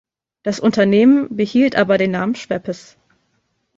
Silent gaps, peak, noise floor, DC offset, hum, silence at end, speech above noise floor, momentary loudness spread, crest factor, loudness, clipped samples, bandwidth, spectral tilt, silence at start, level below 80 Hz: none; 0 dBFS; -67 dBFS; under 0.1%; none; 1 s; 51 dB; 13 LU; 16 dB; -16 LUFS; under 0.1%; 7.8 kHz; -6.5 dB/octave; 0.45 s; -58 dBFS